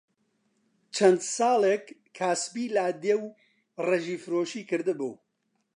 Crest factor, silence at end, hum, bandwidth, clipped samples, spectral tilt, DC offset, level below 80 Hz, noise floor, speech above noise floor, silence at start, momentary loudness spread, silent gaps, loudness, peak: 22 dB; 0.6 s; none; 11 kHz; under 0.1%; -4 dB/octave; under 0.1%; -86 dBFS; -76 dBFS; 50 dB; 0.95 s; 11 LU; none; -27 LUFS; -8 dBFS